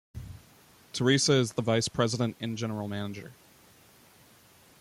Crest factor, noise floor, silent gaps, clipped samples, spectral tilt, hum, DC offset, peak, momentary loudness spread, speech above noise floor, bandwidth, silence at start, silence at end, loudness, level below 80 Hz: 20 dB; -58 dBFS; none; under 0.1%; -4.5 dB/octave; none; under 0.1%; -10 dBFS; 22 LU; 30 dB; 16 kHz; 0.15 s; 1.45 s; -28 LUFS; -60 dBFS